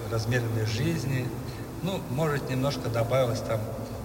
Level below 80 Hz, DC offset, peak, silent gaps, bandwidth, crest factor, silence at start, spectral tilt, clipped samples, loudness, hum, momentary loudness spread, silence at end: -48 dBFS; under 0.1%; -14 dBFS; none; 16.5 kHz; 14 dB; 0 s; -6 dB/octave; under 0.1%; -29 LUFS; none; 8 LU; 0 s